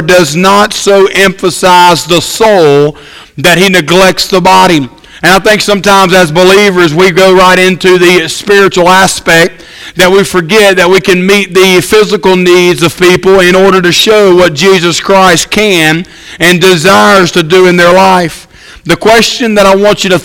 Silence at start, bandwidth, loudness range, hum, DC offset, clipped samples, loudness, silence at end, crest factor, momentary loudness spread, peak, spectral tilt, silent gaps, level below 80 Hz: 0 s; 17 kHz; 1 LU; none; under 0.1%; 8%; -4 LUFS; 0 s; 4 dB; 5 LU; 0 dBFS; -4 dB/octave; none; -34 dBFS